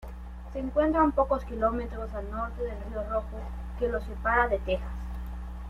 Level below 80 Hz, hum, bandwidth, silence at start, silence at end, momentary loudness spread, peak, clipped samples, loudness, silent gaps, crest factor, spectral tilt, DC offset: -38 dBFS; none; 6.8 kHz; 0 s; 0 s; 15 LU; -12 dBFS; under 0.1%; -30 LUFS; none; 18 dB; -8 dB/octave; under 0.1%